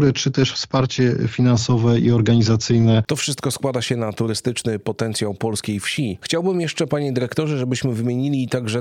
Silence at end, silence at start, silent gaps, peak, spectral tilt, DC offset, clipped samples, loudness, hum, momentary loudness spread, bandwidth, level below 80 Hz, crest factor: 0 s; 0 s; none; -4 dBFS; -5.5 dB/octave; under 0.1%; under 0.1%; -20 LUFS; none; 7 LU; 14.5 kHz; -52 dBFS; 16 dB